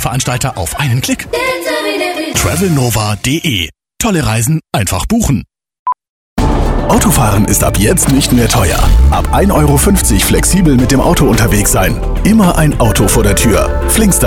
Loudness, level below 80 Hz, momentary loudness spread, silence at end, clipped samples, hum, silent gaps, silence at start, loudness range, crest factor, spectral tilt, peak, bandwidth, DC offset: -11 LUFS; -18 dBFS; 6 LU; 0 s; under 0.1%; none; 5.79-5.86 s, 6.09-6.36 s; 0 s; 4 LU; 10 dB; -4.5 dB/octave; 0 dBFS; 18 kHz; under 0.1%